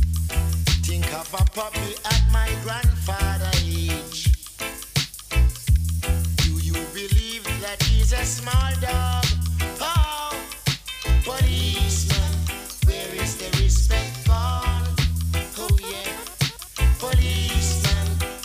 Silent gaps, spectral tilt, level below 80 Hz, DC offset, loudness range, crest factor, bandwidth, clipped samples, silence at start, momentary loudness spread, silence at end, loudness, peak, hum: none; -4 dB/octave; -24 dBFS; under 0.1%; 1 LU; 16 dB; 16 kHz; under 0.1%; 0 s; 6 LU; 0 s; -23 LUFS; -6 dBFS; none